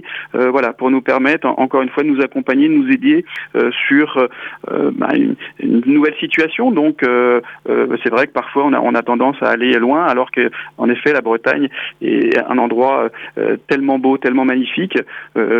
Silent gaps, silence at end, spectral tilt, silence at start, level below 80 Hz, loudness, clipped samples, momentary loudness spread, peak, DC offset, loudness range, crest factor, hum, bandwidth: none; 0 s; -7 dB/octave; 0.05 s; -66 dBFS; -15 LUFS; under 0.1%; 6 LU; 0 dBFS; under 0.1%; 1 LU; 14 dB; none; 6.4 kHz